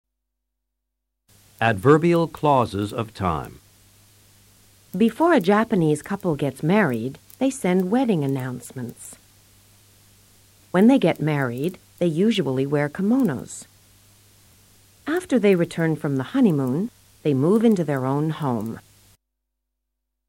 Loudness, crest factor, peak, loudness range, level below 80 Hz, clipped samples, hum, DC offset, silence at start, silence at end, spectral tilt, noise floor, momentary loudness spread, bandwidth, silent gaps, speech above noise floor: -21 LUFS; 20 dB; -4 dBFS; 4 LU; -56 dBFS; under 0.1%; none; under 0.1%; 1.6 s; 1.5 s; -7 dB/octave; -80 dBFS; 15 LU; 16.5 kHz; none; 59 dB